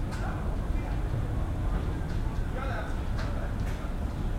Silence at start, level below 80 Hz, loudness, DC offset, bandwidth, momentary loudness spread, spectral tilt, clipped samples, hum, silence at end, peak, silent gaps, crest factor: 0 s; -32 dBFS; -33 LUFS; under 0.1%; 13 kHz; 2 LU; -7 dB/octave; under 0.1%; none; 0 s; -18 dBFS; none; 12 dB